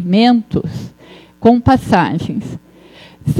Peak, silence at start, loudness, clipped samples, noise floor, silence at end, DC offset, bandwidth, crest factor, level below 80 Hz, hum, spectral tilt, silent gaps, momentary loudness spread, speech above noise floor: 0 dBFS; 0 s; -14 LUFS; under 0.1%; -41 dBFS; 0 s; under 0.1%; 12.5 kHz; 14 dB; -38 dBFS; none; -7.5 dB/octave; none; 18 LU; 28 dB